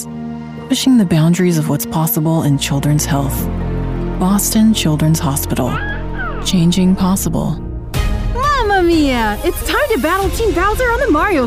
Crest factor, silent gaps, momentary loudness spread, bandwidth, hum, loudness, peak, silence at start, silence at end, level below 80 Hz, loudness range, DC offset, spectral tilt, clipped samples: 12 dB; none; 9 LU; 16 kHz; none; -15 LUFS; -2 dBFS; 0 s; 0 s; -26 dBFS; 2 LU; under 0.1%; -5 dB/octave; under 0.1%